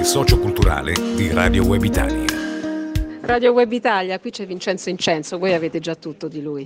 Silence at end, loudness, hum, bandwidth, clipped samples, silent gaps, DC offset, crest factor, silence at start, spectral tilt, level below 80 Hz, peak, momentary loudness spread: 0 s; -20 LUFS; none; 16 kHz; under 0.1%; none; under 0.1%; 18 dB; 0 s; -5 dB/octave; -28 dBFS; 0 dBFS; 11 LU